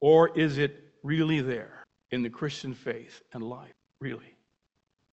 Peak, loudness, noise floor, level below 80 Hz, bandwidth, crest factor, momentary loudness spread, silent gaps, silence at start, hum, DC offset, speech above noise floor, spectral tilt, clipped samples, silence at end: -8 dBFS; -29 LUFS; -78 dBFS; -64 dBFS; 8 kHz; 20 dB; 18 LU; none; 0 s; none; under 0.1%; 51 dB; -7 dB/octave; under 0.1%; 0.95 s